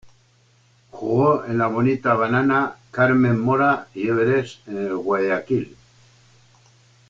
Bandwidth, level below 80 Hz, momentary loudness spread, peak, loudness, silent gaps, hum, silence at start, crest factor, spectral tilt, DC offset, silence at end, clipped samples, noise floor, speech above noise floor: 7.6 kHz; -56 dBFS; 9 LU; -4 dBFS; -20 LUFS; none; none; 0.05 s; 16 dB; -8.5 dB/octave; under 0.1%; 1.4 s; under 0.1%; -58 dBFS; 38 dB